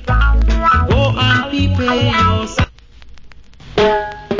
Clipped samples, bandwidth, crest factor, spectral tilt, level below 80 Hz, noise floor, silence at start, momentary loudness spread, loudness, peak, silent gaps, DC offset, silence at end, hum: under 0.1%; 7.6 kHz; 14 dB; -6 dB/octave; -20 dBFS; -37 dBFS; 0 s; 7 LU; -14 LUFS; -2 dBFS; none; under 0.1%; 0 s; none